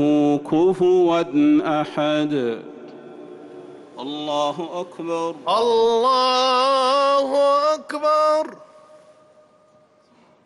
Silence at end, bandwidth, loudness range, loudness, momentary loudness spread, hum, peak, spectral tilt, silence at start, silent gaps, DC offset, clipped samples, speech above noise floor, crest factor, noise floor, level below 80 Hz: 1.8 s; 11.5 kHz; 8 LU; -19 LUFS; 23 LU; none; -10 dBFS; -5 dB/octave; 0 s; none; under 0.1%; under 0.1%; 37 dB; 12 dB; -56 dBFS; -66 dBFS